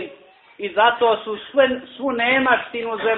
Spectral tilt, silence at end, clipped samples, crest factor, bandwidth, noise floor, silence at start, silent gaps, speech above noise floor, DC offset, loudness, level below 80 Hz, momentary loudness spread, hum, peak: -8.5 dB/octave; 0 s; under 0.1%; 18 dB; 4.2 kHz; -47 dBFS; 0 s; none; 28 dB; under 0.1%; -19 LUFS; -60 dBFS; 10 LU; none; -2 dBFS